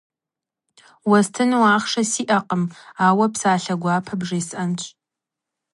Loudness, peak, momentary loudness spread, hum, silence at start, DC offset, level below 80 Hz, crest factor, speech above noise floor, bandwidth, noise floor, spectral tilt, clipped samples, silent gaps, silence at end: -20 LUFS; -2 dBFS; 9 LU; none; 1.05 s; under 0.1%; -66 dBFS; 18 dB; 68 dB; 11.5 kHz; -87 dBFS; -4.5 dB/octave; under 0.1%; none; 0.85 s